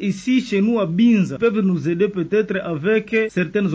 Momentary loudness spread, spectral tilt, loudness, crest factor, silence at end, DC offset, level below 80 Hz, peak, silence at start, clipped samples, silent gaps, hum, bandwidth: 5 LU; -7 dB/octave; -19 LUFS; 12 dB; 0 s; under 0.1%; -56 dBFS; -6 dBFS; 0 s; under 0.1%; none; none; 8 kHz